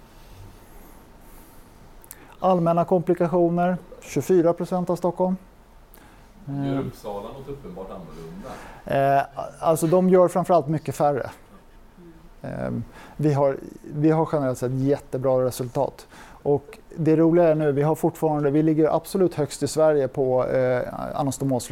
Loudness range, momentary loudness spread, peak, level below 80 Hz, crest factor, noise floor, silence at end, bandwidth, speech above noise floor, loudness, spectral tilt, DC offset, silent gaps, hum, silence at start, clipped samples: 6 LU; 17 LU; -6 dBFS; -50 dBFS; 16 dB; -49 dBFS; 0 s; 17 kHz; 27 dB; -22 LUFS; -7.5 dB/octave; under 0.1%; none; none; 0.2 s; under 0.1%